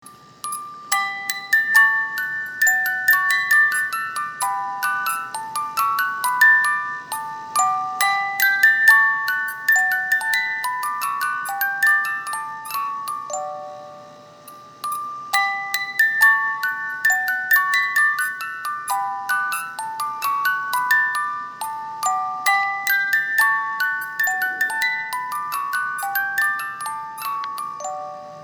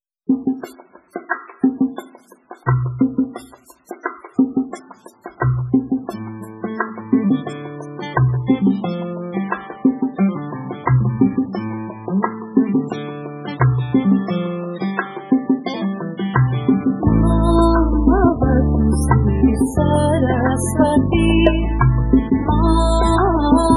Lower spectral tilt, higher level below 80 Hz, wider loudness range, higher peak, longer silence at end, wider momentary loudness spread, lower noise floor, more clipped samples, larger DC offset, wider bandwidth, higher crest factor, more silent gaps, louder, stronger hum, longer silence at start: second, 1 dB/octave vs -7.5 dB/octave; second, -76 dBFS vs -26 dBFS; about the same, 7 LU vs 7 LU; about the same, -2 dBFS vs 0 dBFS; about the same, 0 s vs 0 s; about the same, 14 LU vs 14 LU; about the same, -43 dBFS vs -44 dBFS; neither; neither; first, over 20 kHz vs 12 kHz; about the same, 20 dB vs 18 dB; neither; about the same, -19 LUFS vs -18 LUFS; neither; second, 0.05 s vs 0.3 s